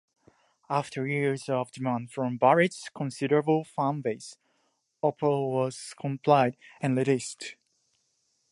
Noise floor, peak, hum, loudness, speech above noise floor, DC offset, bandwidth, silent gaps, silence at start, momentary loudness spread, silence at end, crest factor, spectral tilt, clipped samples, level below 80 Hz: -74 dBFS; -8 dBFS; none; -28 LUFS; 46 dB; under 0.1%; 11.5 kHz; none; 0.7 s; 12 LU; 1 s; 22 dB; -6 dB/octave; under 0.1%; -76 dBFS